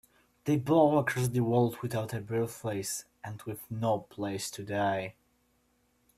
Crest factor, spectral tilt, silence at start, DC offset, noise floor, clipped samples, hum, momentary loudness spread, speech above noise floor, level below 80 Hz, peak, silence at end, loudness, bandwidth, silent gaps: 20 dB; -6 dB/octave; 0.45 s; under 0.1%; -71 dBFS; under 0.1%; none; 14 LU; 41 dB; -66 dBFS; -12 dBFS; 1.05 s; -31 LUFS; 15.5 kHz; none